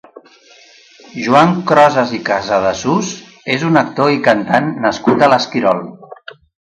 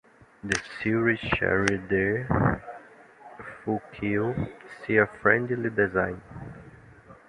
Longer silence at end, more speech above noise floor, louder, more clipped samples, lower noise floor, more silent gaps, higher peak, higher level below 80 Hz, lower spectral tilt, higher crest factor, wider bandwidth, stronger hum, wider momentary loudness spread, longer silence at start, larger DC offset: first, 0.35 s vs 0.15 s; first, 32 dB vs 25 dB; first, -13 LUFS vs -26 LUFS; neither; second, -45 dBFS vs -51 dBFS; neither; first, 0 dBFS vs -4 dBFS; about the same, -52 dBFS vs -48 dBFS; about the same, -5.5 dB/octave vs -6 dB/octave; second, 14 dB vs 24 dB; about the same, 10.5 kHz vs 10.5 kHz; neither; second, 14 LU vs 19 LU; first, 1.15 s vs 0.45 s; neither